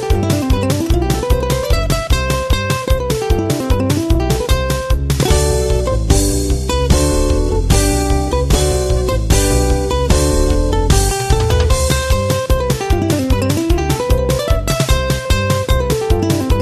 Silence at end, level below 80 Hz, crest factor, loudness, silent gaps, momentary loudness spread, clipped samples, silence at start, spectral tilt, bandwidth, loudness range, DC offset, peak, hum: 0 s; -18 dBFS; 14 dB; -15 LUFS; none; 3 LU; under 0.1%; 0 s; -5 dB/octave; 14 kHz; 2 LU; under 0.1%; 0 dBFS; none